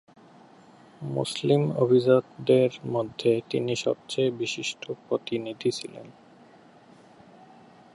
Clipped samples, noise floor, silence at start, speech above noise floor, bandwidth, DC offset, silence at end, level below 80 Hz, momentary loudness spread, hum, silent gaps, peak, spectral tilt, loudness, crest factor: under 0.1%; -53 dBFS; 1 s; 28 dB; 11.5 kHz; under 0.1%; 1.85 s; -70 dBFS; 11 LU; none; none; -6 dBFS; -6 dB/octave; -26 LUFS; 20 dB